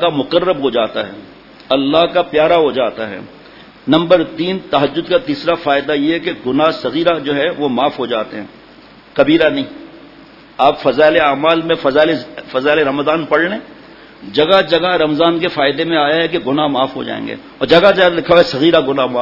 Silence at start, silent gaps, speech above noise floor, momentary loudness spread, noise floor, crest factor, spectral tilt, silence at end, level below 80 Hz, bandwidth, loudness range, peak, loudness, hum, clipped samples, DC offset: 0 s; none; 27 dB; 11 LU; -41 dBFS; 14 dB; -6.5 dB/octave; 0 s; -48 dBFS; 6 kHz; 3 LU; 0 dBFS; -14 LUFS; none; under 0.1%; under 0.1%